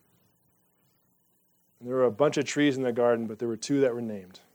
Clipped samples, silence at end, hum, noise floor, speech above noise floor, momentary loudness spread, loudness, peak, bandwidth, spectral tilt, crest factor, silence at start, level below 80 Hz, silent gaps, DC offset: under 0.1%; 0.15 s; none; -69 dBFS; 42 dB; 11 LU; -27 LUFS; -10 dBFS; 20 kHz; -5 dB/octave; 20 dB; 1.8 s; -80 dBFS; none; under 0.1%